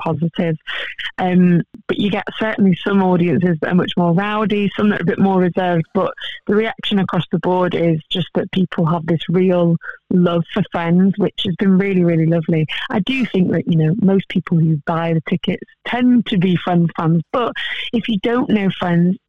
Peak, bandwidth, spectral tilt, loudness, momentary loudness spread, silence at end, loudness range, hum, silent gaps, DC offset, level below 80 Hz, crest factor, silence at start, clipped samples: -4 dBFS; 4.4 kHz; -9 dB/octave; -17 LUFS; 6 LU; 0.1 s; 2 LU; none; none; 0.5%; -54 dBFS; 12 dB; 0 s; under 0.1%